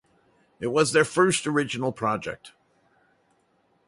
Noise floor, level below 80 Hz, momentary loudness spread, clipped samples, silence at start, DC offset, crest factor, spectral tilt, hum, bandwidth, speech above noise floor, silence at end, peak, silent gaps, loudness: -67 dBFS; -64 dBFS; 13 LU; under 0.1%; 0.6 s; under 0.1%; 20 dB; -4 dB/octave; none; 11.5 kHz; 43 dB; 1.4 s; -6 dBFS; none; -24 LUFS